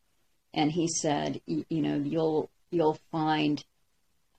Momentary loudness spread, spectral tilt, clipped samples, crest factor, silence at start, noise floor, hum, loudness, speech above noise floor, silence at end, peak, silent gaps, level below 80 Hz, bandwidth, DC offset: 6 LU; -5 dB/octave; under 0.1%; 16 dB; 0.55 s; -75 dBFS; none; -30 LUFS; 47 dB; 0.75 s; -14 dBFS; none; -68 dBFS; 9.2 kHz; under 0.1%